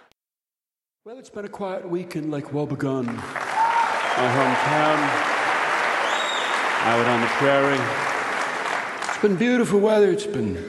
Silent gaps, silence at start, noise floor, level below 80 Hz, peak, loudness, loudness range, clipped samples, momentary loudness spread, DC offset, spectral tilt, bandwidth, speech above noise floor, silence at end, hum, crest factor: none; 1.05 s; under -90 dBFS; -62 dBFS; -4 dBFS; -22 LUFS; 7 LU; under 0.1%; 10 LU; under 0.1%; -4.5 dB/octave; 12 kHz; over 69 dB; 0 s; none; 18 dB